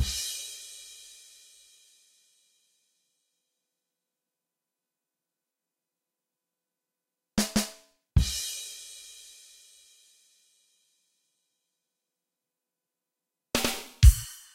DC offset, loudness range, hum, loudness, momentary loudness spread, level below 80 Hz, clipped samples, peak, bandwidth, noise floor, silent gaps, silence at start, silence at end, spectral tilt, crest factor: under 0.1%; 22 LU; none; -28 LUFS; 26 LU; -34 dBFS; under 0.1%; -4 dBFS; 16 kHz; -88 dBFS; none; 0 s; 0.2 s; -4 dB/octave; 28 dB